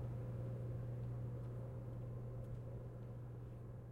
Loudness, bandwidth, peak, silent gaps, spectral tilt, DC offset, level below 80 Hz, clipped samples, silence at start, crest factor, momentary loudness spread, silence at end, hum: -49 LUFS; 3.6 kHz; -36 dBFS; none; -10 dB/octave; under 0.1%; -58 dBFS; under 0.1%; 0 s; 12 dB; 5 LU; 0 s; none